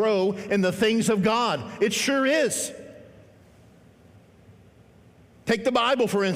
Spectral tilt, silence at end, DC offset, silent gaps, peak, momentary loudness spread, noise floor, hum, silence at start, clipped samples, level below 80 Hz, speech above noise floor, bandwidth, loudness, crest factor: -4 dB/octave; 0 s; under 0.1%; none; -10 dBFS; 6 LU; -54 dBFS; none; 0 s; under 0.1%; -64 dBFS; 31 dB; 16 kHz; -23 LUFS; 16 dB